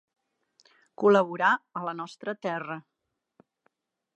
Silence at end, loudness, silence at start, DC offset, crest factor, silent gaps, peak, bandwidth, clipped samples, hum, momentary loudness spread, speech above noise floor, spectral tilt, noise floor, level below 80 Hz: 1.35 s; -27 LUFS; 1 s; under 0.1%; 22 dB; none; -8 dBFS; 8.4 kHz; under 0.1%; none; 14 LU; 47 dB; -6 dB/octave; -74 dBFS; -84 dBFS